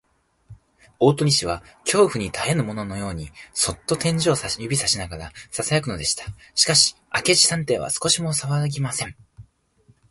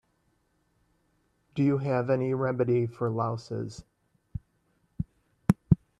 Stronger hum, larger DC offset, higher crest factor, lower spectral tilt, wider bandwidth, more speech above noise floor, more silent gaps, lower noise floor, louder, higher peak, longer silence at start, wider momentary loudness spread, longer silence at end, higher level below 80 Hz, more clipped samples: neither; neither; about the same, 20 dB vs 24 dB; second, -3 dB/octave vs -9 dB/octave; about the same, 12 kHz vs 12.5 kHz; second, 37 dB vs 44 dB; neither; second, -59 dBFS vs -72 dBFS; first, -21 LUFS vs -29 LUFS; about the same, -4 dBFS vs -6 dBFS; second, 0.5 s vs 1.55 s; second, 13 LU vs 18 LU; first, 0.7 s vs 0.25 s; about the same, -48 dBFS vs -50 dBFS; neither